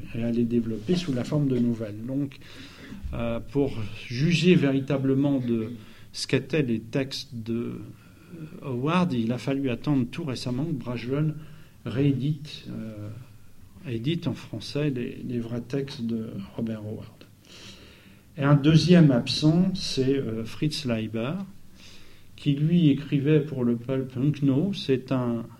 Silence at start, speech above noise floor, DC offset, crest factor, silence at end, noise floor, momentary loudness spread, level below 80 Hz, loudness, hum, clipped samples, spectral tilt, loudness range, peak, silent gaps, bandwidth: 0 s; 26 dB; under 0.1%; 22 dB; 0.05 s; -51 dBFS; 19 LU; -50 dBFS; -26 LUFS; none; under 0.1%; -7 dB/octave; 9 LU; -4 dBFS; none; 12.5 kHz